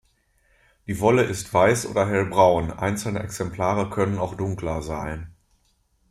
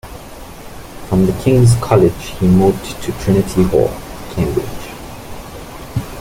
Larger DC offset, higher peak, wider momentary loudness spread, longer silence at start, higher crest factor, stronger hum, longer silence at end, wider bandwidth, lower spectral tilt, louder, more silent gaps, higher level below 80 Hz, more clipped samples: neither; about the same, -4 dBFS vs -2 dBFS; second, 13 LU vs 22 LU; first, 0.9 s vs 0.05 s; first, 20 dB vs 14 dB; neither; first, 0.8 s vs 0 s; about the same, 15.5 kHz vs 16.5 kHz; second, -5.5 dB/octave vs -7 dB/octave; second, -23 LUFS vs -15 LUFS; neither; second, -46 dBFS vs -32 dBFS; neither